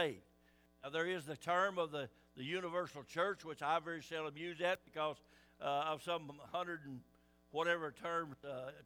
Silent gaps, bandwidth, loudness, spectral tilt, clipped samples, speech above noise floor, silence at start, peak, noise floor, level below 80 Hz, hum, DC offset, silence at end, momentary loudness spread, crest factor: none; over 20 kHz; -41 LUFS; -4.5 dB/octave; under 0.1%; 29 dB; 0 s; -22 dBFS; -71 dBFS; -78 dBFS; none; under 0.1%; 0 s; 10 LU; 20 dB